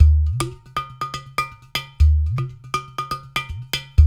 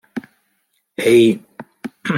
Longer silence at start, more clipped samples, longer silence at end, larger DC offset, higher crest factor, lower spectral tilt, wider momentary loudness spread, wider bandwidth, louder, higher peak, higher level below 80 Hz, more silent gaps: second, 0 s vs 0.15 s; neither; about the same, 0 s vs 0 s; neither; about the same, 18 dB vs 16 dB; about the same, -5 dB/octave vs -5.5 dB/octave; second, 11 LU vs 21 LU; about the same, 14.5 kHz vs 14.5 kHz; second, -23 LUFS vs -15 LUFS; about the same, 0 dBFS vs -2 dBFS; first, -22 dBFS vs -64 dBFS; neither